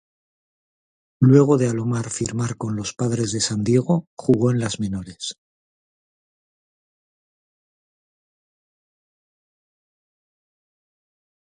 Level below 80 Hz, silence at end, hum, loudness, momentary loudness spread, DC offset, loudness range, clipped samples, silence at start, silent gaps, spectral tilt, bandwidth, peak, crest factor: -56 dBFS; 6.2 s; none; -20 LUFS; 13 LU; under 0.1%; 14 LU; under 0.1%; 1.2 s; 4.07-4.17 s; -6 dB/octave; 10.5 kHz; -2 dBFS; 22 dB